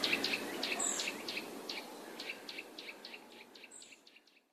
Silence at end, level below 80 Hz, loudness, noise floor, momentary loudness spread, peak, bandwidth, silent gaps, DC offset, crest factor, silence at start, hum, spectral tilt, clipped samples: 0.35 s; -88 dBFS; -39 LUFS; -64 dBFS; 19 LU; -20 dBFS; 14 kHz; none; under 0.1%; 22 dB; 0 s; none; -0.5 dB/octave; under 0.1%